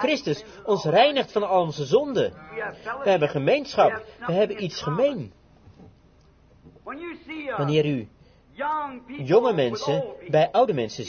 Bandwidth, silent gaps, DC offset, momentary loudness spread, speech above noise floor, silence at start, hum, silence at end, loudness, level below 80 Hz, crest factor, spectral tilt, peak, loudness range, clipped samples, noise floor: 6.8 kHz; none; under 0.1%; 15 LU; 32 dB; 0 s; none; 0 s; -24 LUFS; -60 dBFS; 18 dB; -6 dB/octave; -6 dBFS; 7 LU; under 0.1%; -56 dBFS